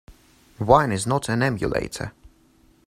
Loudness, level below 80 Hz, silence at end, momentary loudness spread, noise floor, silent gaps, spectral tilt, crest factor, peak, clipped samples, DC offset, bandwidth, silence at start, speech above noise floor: -22 LUFS; -44 dBFS; 0.75 s; 14 LU; -57 dBFS; none; -5.5 dB/octave; 24 dB; 0 dBFS; under 0.1%; under 0.1%; 15.5 kHz; 0.1 s; 36 dB